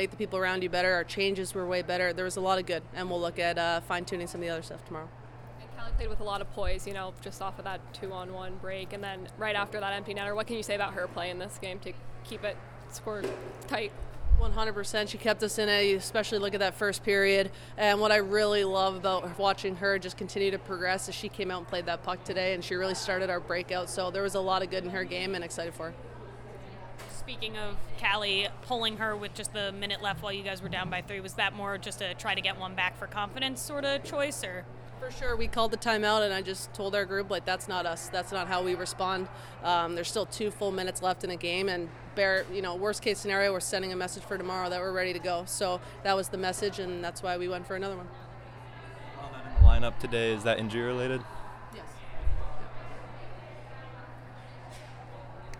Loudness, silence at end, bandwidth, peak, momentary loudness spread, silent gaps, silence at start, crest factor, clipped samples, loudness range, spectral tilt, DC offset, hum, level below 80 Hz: -31 LUFS; 0 s; 17.5 kHz; -6 dBFS; 17 LU; none; 0 s; 24 dB; under 0.1%; 9 LU; -4 dB/octave; under 0.1%; none; -40 dBFS